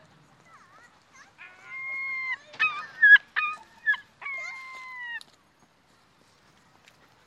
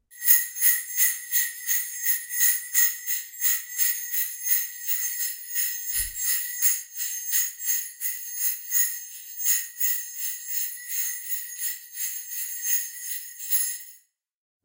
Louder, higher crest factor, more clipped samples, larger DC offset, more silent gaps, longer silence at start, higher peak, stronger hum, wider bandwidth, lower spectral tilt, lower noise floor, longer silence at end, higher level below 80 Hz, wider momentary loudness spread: about the same, -24 LUFS vs -23 LUFS; about the same, 24 dB vs 24 dB; neither; neither; neither; first, 1.4 s vs 0.1 s; second, -6 dBFS vs -2 dBFS; neither; second, 11 kHz vs 16.5 kHz; first, 0 dB/octave vs 5 dB/octave; first, -63 dBFS vs -57 dBFS; first, 2.05 s vs 0.65 s; second, -80 dBFS vs -60 dBFS; first, 23 LU vs 9 LU